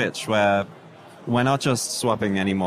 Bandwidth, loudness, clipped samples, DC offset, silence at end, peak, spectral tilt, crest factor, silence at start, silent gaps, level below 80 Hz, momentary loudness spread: 15.5 kHz; -22 LUFS; under 0.1%; under 0.1%; 0 s; -8 dBFS; -4.5 dB/octave; 14 dB; 0 s; none; -62 dBFS; 6 LU